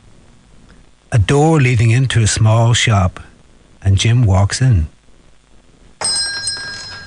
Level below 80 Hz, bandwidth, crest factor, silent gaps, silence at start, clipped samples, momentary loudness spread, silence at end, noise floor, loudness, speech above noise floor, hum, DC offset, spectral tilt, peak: -28 dBFS; 10.5 kHz; 12 dB; none; 1.1 s; under 0.1%; 9 LU; 0 s; -45 dBFS; -14 LUFS; 34 dB; none; under 0.1%; -5 dB/octave; -2 dBFS